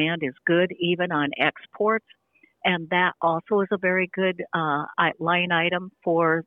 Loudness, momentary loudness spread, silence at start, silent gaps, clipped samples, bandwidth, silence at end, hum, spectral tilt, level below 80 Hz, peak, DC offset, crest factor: -24 LUFS; 5 LU; 0 s; none; under 0.1%; 4 kHz; 0.05 s; none; -9 dB/octave; -70 dBFS; -6 dBFS; under 0.1%; 18 dB